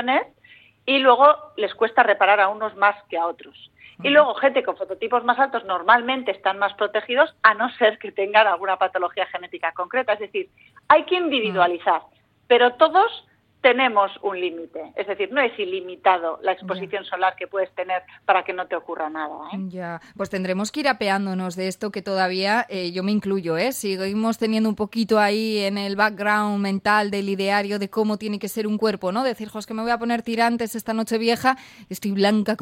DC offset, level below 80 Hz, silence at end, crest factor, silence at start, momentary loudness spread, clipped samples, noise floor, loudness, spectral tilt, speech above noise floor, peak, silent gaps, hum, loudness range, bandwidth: under 0.1%; -66 dBFS; 0 s; 20 dB; 0 s; 12 LU; under 0.1%; -52 dBFS; -21 LUFS; -4.5 dB/octave; 31 dB; -2 dBFS; none; none; 6 LU; 16.5 kHz